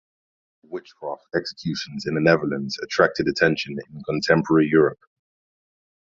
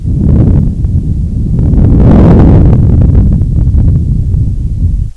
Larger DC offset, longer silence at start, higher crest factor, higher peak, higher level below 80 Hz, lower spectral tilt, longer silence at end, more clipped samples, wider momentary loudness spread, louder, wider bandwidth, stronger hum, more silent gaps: neither; first, 0.7 s vs 0 s; first, 22 dB vs 6 dB; about the same, -2 dBFS vs 0 dBFS; second, -58 dBFS vs -10 dBFS; second, -6 dB/octave vs -11 dB/octave; first, 1.15 s vs 0.05 s; second, under 0.1% vs 6%; first, 15 LU vs 9 LU; second, -22 LUFS vs -8 LUFS; first, 7.6 kHz vs 4 kHz; neither; neither